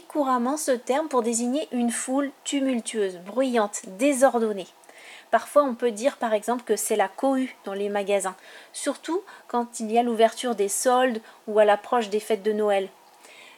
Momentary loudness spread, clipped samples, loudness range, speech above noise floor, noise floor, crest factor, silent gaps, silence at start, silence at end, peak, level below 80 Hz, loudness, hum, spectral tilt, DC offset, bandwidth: 10 LU; under 0.1%; 3 LU; 25 dB; -50 dBFS; 18 dB; none; 0.1 s; 0.1 s; -6 dBFS; -80 dBFS; -25 LUFS; none; -3 dB/octave; under 0.1%; 18 kHz